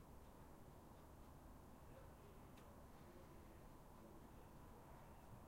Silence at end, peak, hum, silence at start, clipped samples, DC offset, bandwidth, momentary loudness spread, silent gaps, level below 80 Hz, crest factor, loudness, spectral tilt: 0 s; -48 dBFS; none; 0 s; under 0.1%; under 0.1%; 16 kHz; 1 LU; none; -68 dBFS; 14 dB; -64 LUFS; -6 dB/octave